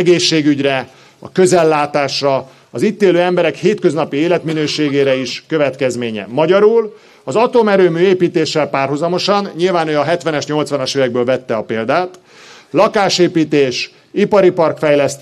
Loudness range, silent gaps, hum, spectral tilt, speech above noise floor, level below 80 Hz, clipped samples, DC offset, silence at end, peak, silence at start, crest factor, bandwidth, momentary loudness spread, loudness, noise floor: 2 LU; none; none; -5 dB/octave; 27 dB; -60 dBFS; under 0.1%; under 0.1%; 0 s; 0 dBFS; 0 s; 12 dB; 12 kHz; 8 LU; -14 LUFS; -41 dBFS